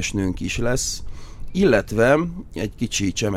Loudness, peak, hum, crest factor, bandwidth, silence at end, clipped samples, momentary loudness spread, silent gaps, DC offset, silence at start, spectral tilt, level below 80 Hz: -21 LUFS; -4 dBFS; none; 18 dB; 16 kHz; 0 s; under 0.1%; 12 LU; none; under 0.1%; 0 s; -4.5 dB/octave; -34 dBFS